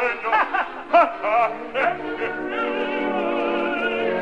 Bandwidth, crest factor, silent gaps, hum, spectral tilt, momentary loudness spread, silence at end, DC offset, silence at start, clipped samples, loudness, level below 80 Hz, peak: 8.2 kHz; 18 dB; none; none; -5.5 dB/octave; 8 LU; 0 s; 0.4%; 0 s; under 0.1%; -22 LUFS; -58 dBFS; -6 dBFS